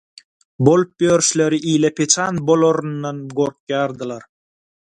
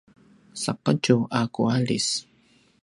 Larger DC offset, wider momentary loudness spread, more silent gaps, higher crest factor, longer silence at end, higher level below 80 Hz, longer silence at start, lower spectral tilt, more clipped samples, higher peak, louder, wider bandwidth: neither; about the same, 11 LU vs 9 LU; first, 3.60-3.67 s vs none; about the same, 18 dB vs 20 dB; about the same, 0.65 s vs 0.6 s; first, -58 dBFS vs -64 dBFS; about the same, 0.6 s vs 0.55 s; about the same, -4.5 dB/octave vs -5 dB/octave; neither; first, 0 dBFS vs -6 dBFS; first, -17 LUFS vs -24 LUFS; about the same, 11.5 kHz vs 11.5 kHz